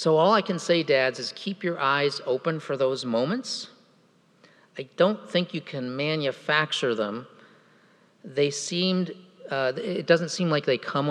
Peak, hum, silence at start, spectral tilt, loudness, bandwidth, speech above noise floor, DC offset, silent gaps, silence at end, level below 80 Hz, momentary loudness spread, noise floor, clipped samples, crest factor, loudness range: -4 dBFS; none; 0 s; -4.5 dB/octave; -26 LUFS; 11 kHz; 36 dB; under 0.1%; none; 0 s; -88 dBFS; 11 LU; -61 dBFS; under 0.1%; 22 dB; 3 LU